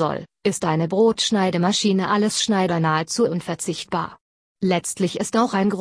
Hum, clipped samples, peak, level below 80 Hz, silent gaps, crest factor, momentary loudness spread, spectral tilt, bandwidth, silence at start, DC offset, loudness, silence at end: none; under 0.1%; -6 dBFS; -60 dBFS; 4.21-4.55 s; 16 dB; 8 LU; -4.5 dB/octave; 11 kHz; 0 s; under 0.1%; -21 LUFS; 0 s